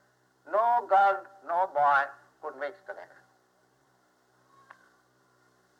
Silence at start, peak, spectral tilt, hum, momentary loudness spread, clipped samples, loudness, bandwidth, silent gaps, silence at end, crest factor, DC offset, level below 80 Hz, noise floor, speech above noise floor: 0.45 s; -14 dBFS; -4 dB/octave; none; 20 LU; under 0.1%; -27 LUFS; 8 kHz; none; 2.75 s; 18 dB; under 0.1%; -88 dBFS; -68 dBFS; 40 dB